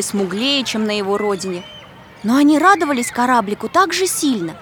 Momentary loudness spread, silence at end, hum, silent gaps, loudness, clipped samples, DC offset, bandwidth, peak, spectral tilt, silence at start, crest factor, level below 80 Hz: 11 LU; 0 s; none; none; -16 LUFS; under 0.1%; under 0.1%; over 20 kHz; 0 dBFS; -3.5 dB/octave; 0 s; 16 dB; -56 dBFS